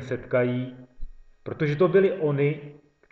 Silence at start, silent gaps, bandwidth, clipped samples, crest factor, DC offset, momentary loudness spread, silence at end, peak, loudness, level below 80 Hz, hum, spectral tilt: 0 s; none; 6.2 kHz; under 0.1%; 16 dB; under 0.1%; 17 LU; 0.4 s; -8 dBFS; -24 LUFS; -46 dBFS; none; -9 dB/octave